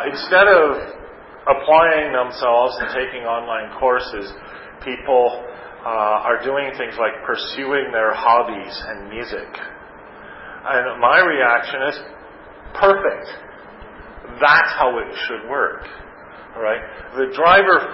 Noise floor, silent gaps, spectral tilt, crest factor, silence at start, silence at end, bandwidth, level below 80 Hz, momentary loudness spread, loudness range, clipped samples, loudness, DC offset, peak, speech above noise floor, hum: -40 dBFS; none; -8 dB/octave; 18 dB; 0 s; 0 s; 5.8 kHz; -50 dBFS; 21 LU; 4 LU; under 0.1%; -17 LUFS; under 0.1%; -2 dBFS; 22 dB; none